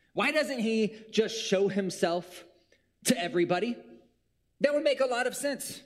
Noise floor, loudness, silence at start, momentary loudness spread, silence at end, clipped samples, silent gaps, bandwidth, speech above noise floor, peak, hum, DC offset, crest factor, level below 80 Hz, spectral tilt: -74 dBFS; -29 LUFS; 0.15 s; 6 LU; 0.05 s; under 0.1%; none; 16 kHz; 45 dB; -10 dBFS; none; under 0.1%; 20 dB; -74 dBFS; -4 dB/octave